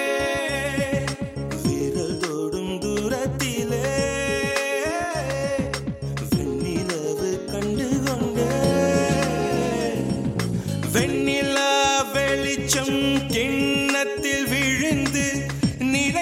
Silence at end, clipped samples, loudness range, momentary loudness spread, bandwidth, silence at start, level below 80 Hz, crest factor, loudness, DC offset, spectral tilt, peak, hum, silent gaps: 0 s; under 0.1%; 4 LU; 6 LU; 16.5 kHz; 0 s; -42 dBFS; 18 dB; -23 LUFS; under 0.1%; -4.5 dB/octave; -6 dBFS; none; none